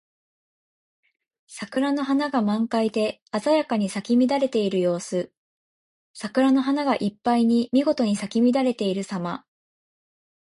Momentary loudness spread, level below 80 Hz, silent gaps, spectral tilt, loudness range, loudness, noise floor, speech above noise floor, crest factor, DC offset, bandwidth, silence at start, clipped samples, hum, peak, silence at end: 10 LU; -68 dBFS; 3.22-3.26 s, 5.37-6.14 s; -6 dB/octave; 3 LU; -23 LUFS; under -90 dBFS; over 68 dB; 16 dB; under 0.1%; 11.5 kHz; 1.5 s; under 0.1%; none; -8 dBFS; 1.05 s